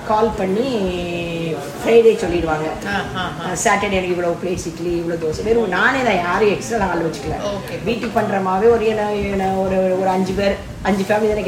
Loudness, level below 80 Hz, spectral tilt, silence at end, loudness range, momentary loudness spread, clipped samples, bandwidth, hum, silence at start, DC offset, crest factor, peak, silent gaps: -18 LUFS; -38 dBFS; -5 dB/octave; 0 s; 1 LU; 8 LU; under 0.1%; 15.5 kHz; none; 0 s; under 0.1%; 16 dB; -2 dBFS; none